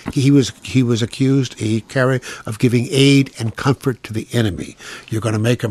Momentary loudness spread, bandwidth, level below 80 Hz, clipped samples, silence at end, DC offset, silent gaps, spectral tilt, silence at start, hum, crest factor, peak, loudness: 11 LU; 13.5 kHz; -48 dBFS; under 0.1%; 0 s; under 0.1%; none; -6 dB/octave; 0.05 s; none; 16 dB; 0 dBFS; -17 LUFS